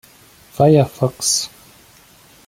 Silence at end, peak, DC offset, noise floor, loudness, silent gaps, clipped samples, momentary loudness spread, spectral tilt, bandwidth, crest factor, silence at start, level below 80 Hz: 1 s; -2 dBFS; under 0.1%; -48 dBFS; -16 LUFS; none; under 0.1%; 15 LU; -5 dB/octave; 16.5 kHz; 18 dB; 0.6 s; -52 dBFS